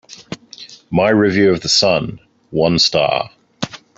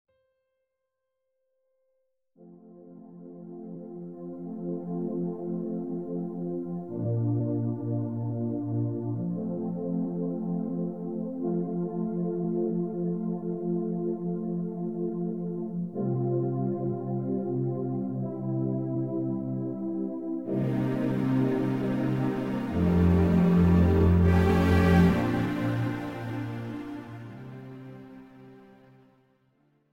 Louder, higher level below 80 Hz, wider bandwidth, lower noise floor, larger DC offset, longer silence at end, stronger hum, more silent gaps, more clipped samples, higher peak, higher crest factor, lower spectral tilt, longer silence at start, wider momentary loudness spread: first, -14 LUFS vs -28 LUFS; about the same, -48 dBFS vs -44 dBFS; first, 8 kHz vs 7.2 kHz; second, -39 dBFS vs -82 dBFS; second, under 0.1% vs 0.2%; second, 0.2 s vs 1.2 s; neither; neither; neither; first, -2 dBFS vs -8 dBFS; about the same, 16 dB vs 20 dB; second, -4 dB/octave vs -9 dB/octave; second, 0.1 s vs 2.4 s; about the same, 20 LU vs 18 LU